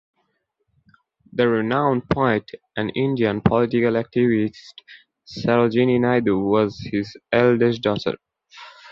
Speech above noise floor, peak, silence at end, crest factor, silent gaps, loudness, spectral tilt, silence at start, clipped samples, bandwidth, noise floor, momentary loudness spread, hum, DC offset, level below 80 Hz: 52 dB; -2 dBFS; 0.05 s; 20 dB; none; -20 LUFS; -8 dB/octave; 1.35 s; under 0.1%; 7 kHz; -72 dBFS; 10 LU; none; under 0.1%; -50 dBFS